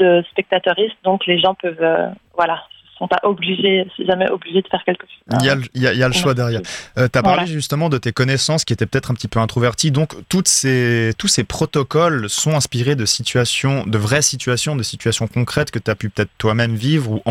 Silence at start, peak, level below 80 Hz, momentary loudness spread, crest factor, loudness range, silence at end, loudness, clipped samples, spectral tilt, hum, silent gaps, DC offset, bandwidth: 0 s; 0 dBFS; -46 dBFS; 6 LU; 16 dB; 2 LU; 0 s; -17 LUFS; under 0.1%; -4 dB/octave; none; none; under 0.1%; 16 kHz